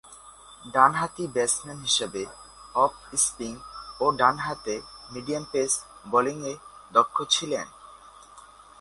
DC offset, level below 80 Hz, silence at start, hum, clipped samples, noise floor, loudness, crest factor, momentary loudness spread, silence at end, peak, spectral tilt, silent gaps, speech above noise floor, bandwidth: under 0.1%; -60 dBFS; 0.05 s; none; under 0.1%; -50 dBFS; -25 LUFS; 24 dB; 18 LU; 0.35 s; -4 dBFS; -2 dB/octave; none; 24 dB; 11.5 kHz